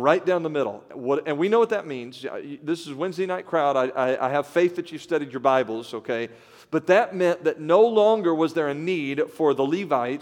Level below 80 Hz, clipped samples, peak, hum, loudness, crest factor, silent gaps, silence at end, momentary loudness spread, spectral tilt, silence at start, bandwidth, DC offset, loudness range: -78 dBFS; under 0.1%; -4 dBFS; none; -23 LUFS; 18 dB; none; 0 s; 11 LU; -6 dB/octave; 0 s; 14.5 kHz; under 0.1%; 4 LU